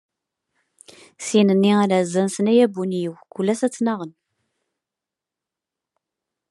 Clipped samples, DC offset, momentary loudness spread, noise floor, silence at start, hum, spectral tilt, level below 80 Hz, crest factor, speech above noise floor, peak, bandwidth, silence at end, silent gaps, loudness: under 0.1%; under 0.1%; 13 LU; -87 dBFS; 1.2 s; none; -6 dB/octave; -76 dBFS; 18 dB; 68 dB; -4 dBFS; 12 kHz; 2.4 s; none; -20 LUFS